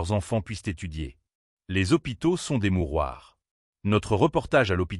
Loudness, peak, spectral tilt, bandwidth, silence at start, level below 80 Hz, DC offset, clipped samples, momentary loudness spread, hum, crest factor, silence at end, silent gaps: -26 LUFS; -8 dBFS; -6 dB/octave; 12 kHz; 0 s; -42 dBFS; under 0.1%; under 0.1%; 12 LU; none; 18 dB; 0 s; 1.35-1.57 s, 3.51-3.73 s